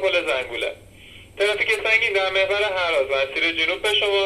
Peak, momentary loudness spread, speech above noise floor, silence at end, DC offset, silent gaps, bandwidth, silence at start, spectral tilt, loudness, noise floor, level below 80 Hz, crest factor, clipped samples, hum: -4 dBFS; 7 LU; 23 dB; 0 s; under 0.1%; none; 14 kHz; 0 s; -2 dB/octave; -20 LUFS; -45 dBFS; -54 dBFS; 16 dB; under 0.1%; none